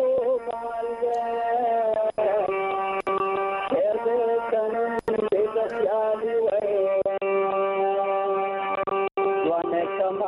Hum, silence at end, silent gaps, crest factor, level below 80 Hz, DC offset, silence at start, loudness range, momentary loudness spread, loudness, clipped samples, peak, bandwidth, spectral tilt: none; 0 s; none; 12 dB; -62 dBFS; under 0.1%; 0 s; 1 LU; 3 LU; -25 LUFS; under 0.1%; -12 dBFS; 10.5 kHz; -6.5 dB/octave